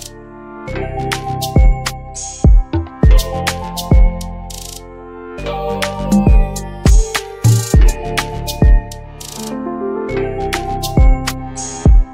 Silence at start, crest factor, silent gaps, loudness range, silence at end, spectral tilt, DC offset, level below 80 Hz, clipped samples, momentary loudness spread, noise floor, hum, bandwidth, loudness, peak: 0 s; 12 dB; none; 3 LU; 0 s; -5.5 dB/octave; under 0.1%; -16 dBFS; under 0.1%; 15 LU; -33 dBFS; none; 16.5 kHz; -16 LUFS; 0 dBFS